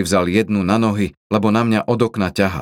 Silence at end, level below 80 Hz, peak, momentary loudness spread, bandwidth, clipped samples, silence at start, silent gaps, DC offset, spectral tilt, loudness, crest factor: 0 s; -46 dBFS; -2 dBFS; 3 LU; 15.5 kHz; under 0.1%; 0 s; 1.17-1.30 s; under 0.1%; -6 dB/octave; -17 LUFS; 16 dB